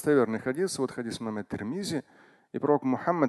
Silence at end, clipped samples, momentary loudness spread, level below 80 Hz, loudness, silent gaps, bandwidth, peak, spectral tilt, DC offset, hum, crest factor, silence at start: 0 s; under 0.1%; 9 LU; -64 dBFS; -30 LUFS; none; 12.5 kHz; -10 dBFS; -5.5 dB/octave; under 0.1%; none; 18 dB; 0 s